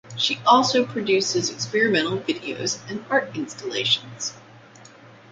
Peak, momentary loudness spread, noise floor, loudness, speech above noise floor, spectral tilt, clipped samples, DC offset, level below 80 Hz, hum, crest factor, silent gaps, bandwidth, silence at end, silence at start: -4 dBFS; 14 LU; -47 dBFS; -22 LUFS; 24 dB; -3 dB/octave; under 0.1%; under 0.1%; -66 dBFS; none; 20 dB; none; 9.4 kHz; 0.25 s; 0.05 s